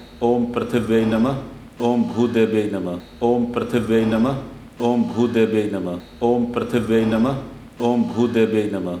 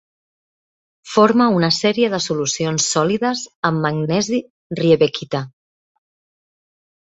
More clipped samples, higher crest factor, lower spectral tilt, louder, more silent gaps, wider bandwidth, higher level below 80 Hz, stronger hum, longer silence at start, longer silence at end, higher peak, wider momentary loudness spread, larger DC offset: neither; about the same, 14 dB vs 18 dB; first, -7.5 dB/octave vs -4.5 dB/octave; about the same, -20 LUFS vs -18 LUFS; second, none vs 3.55-3.63 s, 4.50-4.70 s; first, 12.5 kHz vs 8.2 kHz; first, -48 dBFS vs -58 dBFS; neither; second, 0 s vs 1.05 s; second, 0 s vs 1.7 s; second, -6 dBFS vs -2 dBFS; about the same, 9 LU vs 10 LU; neither